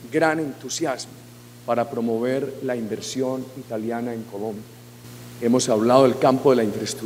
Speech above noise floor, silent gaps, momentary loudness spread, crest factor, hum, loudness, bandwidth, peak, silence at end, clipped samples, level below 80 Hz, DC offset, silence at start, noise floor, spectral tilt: 20 dB; none; 20 LU; 22 dB; 60 Hz at -45 dBFS; -22 LUFS; 16 kHz; -2 dBFS; 0 s; under 0.1%; -64 dBFS; under 0.1%; 0 s; -42 dBFS; -5 dB/octave